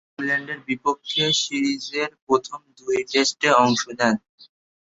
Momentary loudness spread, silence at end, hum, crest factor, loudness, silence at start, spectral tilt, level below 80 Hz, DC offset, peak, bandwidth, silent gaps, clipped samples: 10 LU; 0.5 s; none; 20 dB; -22 LUFS; 0.2 s; -3 dB/octave; -64 dBFS; under 0.1%; -2 dBFS; 8 kHz; 2.22-2.27 s, 4.29-4.38 s; under 0.1%